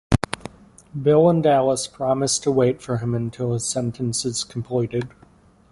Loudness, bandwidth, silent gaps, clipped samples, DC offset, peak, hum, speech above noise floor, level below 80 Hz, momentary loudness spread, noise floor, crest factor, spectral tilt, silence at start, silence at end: -21 LUFS; 11.5 kHz; none; under 0.1%; under 0.1%; -2 dBFS; none; 32 dB; -44 dBFS; 13 LU; -53 dBFS; 20 dB; -5 dB/octave; 0.1 s; 0.65 s